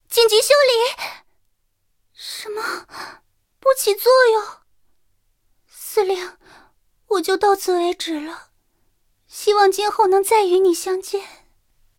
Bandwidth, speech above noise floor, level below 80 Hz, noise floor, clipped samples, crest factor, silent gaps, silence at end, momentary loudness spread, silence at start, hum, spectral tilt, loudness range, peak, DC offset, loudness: 17 kHz; 50 dB; -64 dBFS; -67 dBFS; under 0.1%; 20 dB; none; 0.7 s; 21 LU; 0.1 s; none; -0.5 dB/octave; 5 LU; 0 dBFS; under 0.1%; -18 LUFS